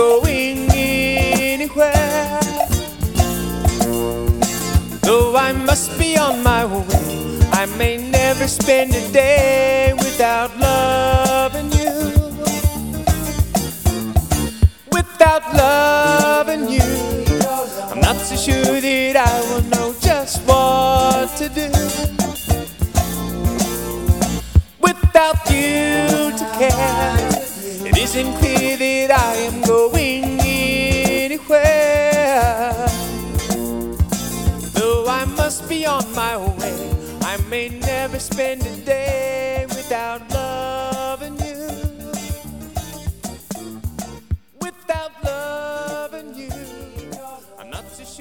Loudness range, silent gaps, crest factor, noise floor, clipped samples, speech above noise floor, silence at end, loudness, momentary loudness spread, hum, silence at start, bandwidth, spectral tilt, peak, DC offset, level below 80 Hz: 12 LU; none; 18 dB; -38 dBFS; under 0.1%; 22 dB; 0 s; -17 LUFS; 14 LU; none; 0 s; 19.5 kHz; -4.5 dB/octave; 0 dBFS; 0.3%; -26 dBFS